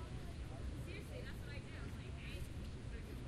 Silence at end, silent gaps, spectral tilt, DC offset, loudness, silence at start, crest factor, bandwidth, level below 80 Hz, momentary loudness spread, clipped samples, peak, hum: 0 s; none; -6 dB/octave; under 0.1%; -49 LUFS; 0 s; 12 dB; 13.5 kHz; -52 dBFS; 1 LU; under 0.1%; -34 dBFS; none